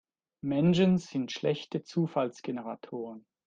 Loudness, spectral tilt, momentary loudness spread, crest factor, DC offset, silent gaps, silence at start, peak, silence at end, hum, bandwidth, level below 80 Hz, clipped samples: -30 LUFS; -7 dB/octave; 15 LU; 16 dB; under 0.1%; none; 0.45 s; -14 dBFS; 0.25 s; none; 7.6 kHz; -66 dBFS; under 0.1%